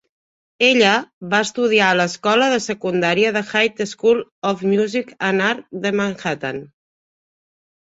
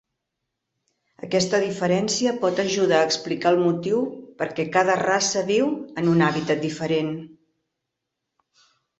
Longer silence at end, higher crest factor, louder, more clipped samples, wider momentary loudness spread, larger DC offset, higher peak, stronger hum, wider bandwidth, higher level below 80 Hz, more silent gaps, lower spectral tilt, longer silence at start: second, 1.25 s vs 1.75 s; about the same, 18 dB vs 20 dB; first, -18 LUFS vs -22 LUFS; neither; about the same, 9 LU vs 7 LU; neither; about the same, -2 dBFS vs -4 dBFS; neither; about the same, 8 kHz vs 8.2 kHz; about the same, -62 dBFS vs -64 dBFS; first, 1.13-1.21 s, 4.32-4.42 s vs none; about the same, -4 dB/octave vs -4.5 dB/octave; second, 0.6 s vs 1.25 s